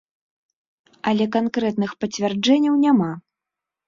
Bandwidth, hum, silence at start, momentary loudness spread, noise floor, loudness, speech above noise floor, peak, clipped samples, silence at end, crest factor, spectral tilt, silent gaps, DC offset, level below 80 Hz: 7.6 kHz; none; 1.05 s; 10 LU; -86 dBFS; -20 LUFS; 67 dB; -4 dBFS; under 0.1%; 0.7 s; 16 dB; -5.5 dB/octave; none; under 0.1%; -64 dBFS